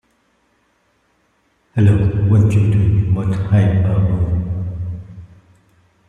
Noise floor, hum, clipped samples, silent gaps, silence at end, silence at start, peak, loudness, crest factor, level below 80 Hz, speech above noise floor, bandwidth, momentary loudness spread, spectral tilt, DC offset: -61 dBFS; none; under 0.1%; none; 0.85 s; 1.75 s; -2 dBFS; -16 LUFS; 14 dB; -36 dBFS; 48 dB; 7 kHz; 12 LU; -9.5 dB/octave; under 0.1%